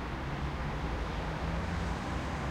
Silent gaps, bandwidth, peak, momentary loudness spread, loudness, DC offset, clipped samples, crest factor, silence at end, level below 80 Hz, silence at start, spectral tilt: none; 12 kHz; -22 dBFS; 2 LU; -36 LUFS; under 0.1%; under 0.1%; 12 dB; 0 s; -40 dBFS; 0 s; -6 dB/octave